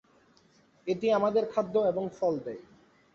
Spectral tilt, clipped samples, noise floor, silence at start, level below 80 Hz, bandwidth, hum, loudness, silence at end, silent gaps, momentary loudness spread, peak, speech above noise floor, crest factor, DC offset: -7 dB/octave; under 0.1%; -63 dBFS; 0.85 s; -70 dBFS; 7.2 kHz; none; -29 LUFS; 0.55 s; none; 15 LU; -14 dBFS; 35 dB; 16 dB; under 0.1%